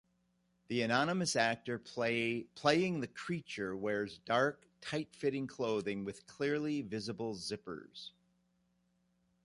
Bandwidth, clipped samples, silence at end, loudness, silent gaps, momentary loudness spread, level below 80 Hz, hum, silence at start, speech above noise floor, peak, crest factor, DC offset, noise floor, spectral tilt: 11.5 kHz; under 0.1%; 1.35 s; -36 LUFS; none; 11 LU; -74 dBFS; 60 Hz at -65 dBFS; 0.7 s; 41 dB; -14 dBFS; 24 dB; under 0.1%; -77 dBFS; -4.5 dB/octave